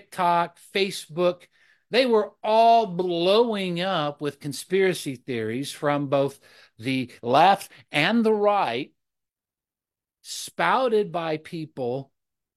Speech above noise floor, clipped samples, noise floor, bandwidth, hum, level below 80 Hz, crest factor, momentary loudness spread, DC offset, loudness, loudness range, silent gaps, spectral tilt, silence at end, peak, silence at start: over 67 dB; under 0.1%; under -90 dBFS; 13 kHz; none; -74 dBFS; 20 dB; 13 LU; under 0.1%; -23 LUFS; 5 LU; none; -5 dB/octave; 0.55 s; -4 dBFS; 0.1 s